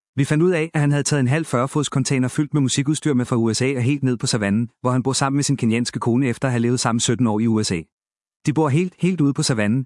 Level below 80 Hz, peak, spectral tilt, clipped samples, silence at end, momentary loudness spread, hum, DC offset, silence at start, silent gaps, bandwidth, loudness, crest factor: -60 dBFS; -4 dBFS; -5.5 dB/octave; under 0.1%; 0 s; 3 LU; none; under 0.1%; 0.15 s; 7.92-7.98 s, 8.36-8.40 s; 12 kHz; -20 LUFS; 16 dB